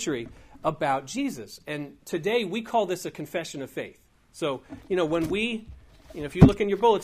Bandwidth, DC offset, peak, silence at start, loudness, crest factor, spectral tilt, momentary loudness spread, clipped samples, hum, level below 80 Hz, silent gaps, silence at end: 15.5 kHz; under 0.1%; -2 dBFS; 0 s; -26 LUFS; 24 dB; -6 dB/octave; 18 LU; under 0.1%; none; -46 dBFS; none; 0 s